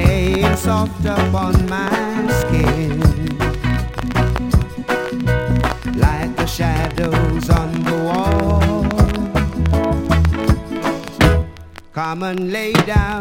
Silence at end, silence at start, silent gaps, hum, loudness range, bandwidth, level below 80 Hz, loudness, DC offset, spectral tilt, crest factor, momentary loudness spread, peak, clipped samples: 0 s; 0 s; none; none; 2 LU; 17 kHz; -24 dBFS; -18 LUFS; under 0.1%; -6.5 dB/octave; 16 dB; 6 LU; 0 dBFS; under 0.1%